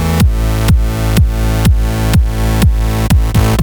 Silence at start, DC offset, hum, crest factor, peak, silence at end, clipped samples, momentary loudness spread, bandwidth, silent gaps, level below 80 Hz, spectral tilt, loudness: 0 s; under 0.1%; none; 10 dB; 0 dBFS; 0 s; under 0.1%; 2 LU; over 20 kHz; none; -14 dBFS; -6 dB/octave; -13 LUFS